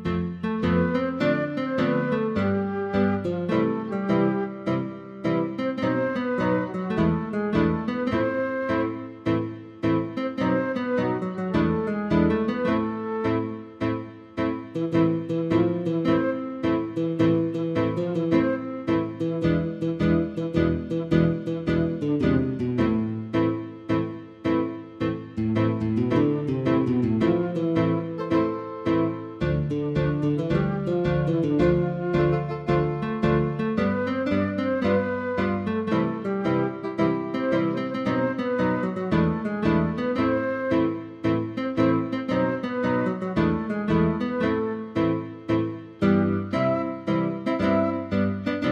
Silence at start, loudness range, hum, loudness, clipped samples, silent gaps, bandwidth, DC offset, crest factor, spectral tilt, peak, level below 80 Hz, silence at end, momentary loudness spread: 0 s; 2 LU; none; -25 LUFS; under 0.1%; none; 7.2 kHz; under 0.1%; 18 dB; -9 dB/octave; -6 dBFS; -46 dBFS; 0 s; 5 LU